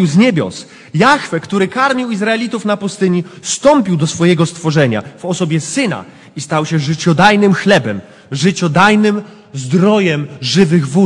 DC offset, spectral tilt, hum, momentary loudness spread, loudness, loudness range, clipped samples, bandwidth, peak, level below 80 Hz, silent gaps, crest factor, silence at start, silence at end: under 0.1%; -5.5 dB/octave; none; 12 LU; -13 LUFS; 3 LU; 0.1%; 11 kHz; 0 dBFS; -52 dBFS; none; 12 dB; 0 s; 0 s